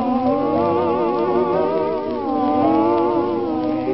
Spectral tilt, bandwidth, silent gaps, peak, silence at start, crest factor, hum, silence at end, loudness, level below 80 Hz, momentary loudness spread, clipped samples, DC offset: -11.5 dB/octave; 5.8 kHz; none; -6 dBFS; 0 s; 14 dB; none; 0 s; -19 LUFS; -52 dBFS; 5 LU; under 0.1%; 0.4%